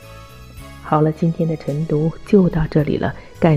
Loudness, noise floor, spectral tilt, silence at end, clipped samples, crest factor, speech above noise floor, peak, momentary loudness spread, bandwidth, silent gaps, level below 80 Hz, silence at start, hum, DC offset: -18 LUFS; -38 dBFS; -9 dB/octave; 0 s; under 0.1%; 16 dB; 21 dB; -2 dBFS; 23 LU; 11.5 kHz; none; -38 dBFS; 0 s; none; under 0.1%